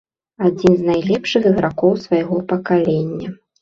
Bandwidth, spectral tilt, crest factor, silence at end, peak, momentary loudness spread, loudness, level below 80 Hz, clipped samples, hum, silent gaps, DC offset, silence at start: 7.6 kHz; -7.5 dB/octave; 16 dB; 0.25 s; -2 dBFS; 6 LU; -17 LUFS; -50 dBFS; under 0.1%; none; none; under 0.1%; 0.4 s